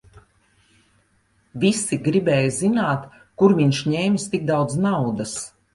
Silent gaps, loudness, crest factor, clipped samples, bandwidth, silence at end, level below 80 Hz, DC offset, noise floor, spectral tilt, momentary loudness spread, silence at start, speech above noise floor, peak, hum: none; -21 LUFS; 20 dB; under 0.1%; 11.5 kHz; 0.25 s; -56 dBFS; under 0.1%; -63 dBFS; -5.5 dB/octave; 10 LU; 0.15 s; 43 dB; -2 dBFS; none